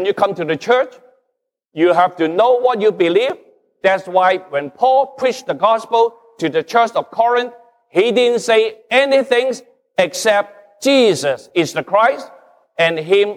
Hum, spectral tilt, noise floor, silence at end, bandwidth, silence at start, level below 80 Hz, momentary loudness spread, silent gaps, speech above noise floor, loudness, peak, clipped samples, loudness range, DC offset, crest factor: none; -4 dB/octave; -73 dBFS; 0 s; 14.5 kHz; 0 s; -70 dBFS; 8 LU; none; 58 dB; -16 LUFS; -2 dBFS; under 0.1%; 1 LU; under 0.1%; 14 dB